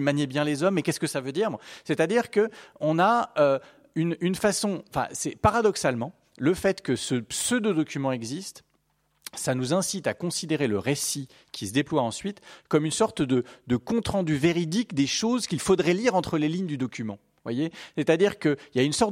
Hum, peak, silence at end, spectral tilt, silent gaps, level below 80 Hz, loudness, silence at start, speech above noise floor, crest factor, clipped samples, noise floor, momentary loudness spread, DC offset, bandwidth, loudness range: none; -6 dBFS; 0 s; -4.5 dB/octave; none; -56 dBFS; -26 LUFS; 0 s; 45 dB; 20 dB; under 0.1%; -70 dBFS; 10 LU; under 0.1%; 16.5 kHz; 3 LU